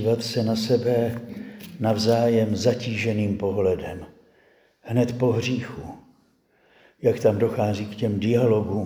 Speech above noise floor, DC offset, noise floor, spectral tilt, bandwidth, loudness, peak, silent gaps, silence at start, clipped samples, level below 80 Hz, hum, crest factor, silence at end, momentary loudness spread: 40 dB; under 0.1%; -62 dBFS; -6.5 dB/octave; over 20 kHz; -23 LUFS; -8 dBFS; none; 0 s; under 0.1%; -56 dBFS; none; 16 dB; 0 s; 15 LU